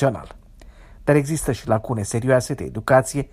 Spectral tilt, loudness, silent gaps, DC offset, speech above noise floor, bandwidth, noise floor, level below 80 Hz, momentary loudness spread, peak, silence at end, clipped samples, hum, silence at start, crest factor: -6 dB/octave; -21 LUFS; none; under 0.1%; 24 dB; 15.5 kHz; -45 dBFS; -42 dBFS; 9 LU; -4 dBFS; 0.05 s; under 0.1%; none; 0 s; 18 dB